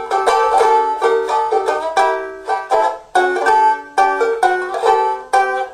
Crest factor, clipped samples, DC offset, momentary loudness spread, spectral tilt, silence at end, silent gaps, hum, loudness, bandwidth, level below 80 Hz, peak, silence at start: 14 dB; under 0.1%; under 0.1%; 5 LU; -2 dB/octave; 0 s; none; none; -15 LUFS; 14.5 kHz; -56 dBFS; -2 dBFS; 0 s